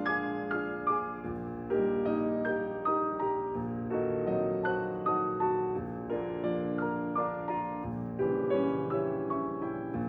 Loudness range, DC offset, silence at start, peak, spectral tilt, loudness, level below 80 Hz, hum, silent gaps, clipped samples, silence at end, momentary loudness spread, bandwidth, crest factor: 1 LU; under 0.1%; 0 s; -18 dBFS; -10.5 dB/octave; -32 LUFS; -60 dBFS; none; none; under 0.1%; 0 s; 6 LU; 5.4 kHz; 14 dB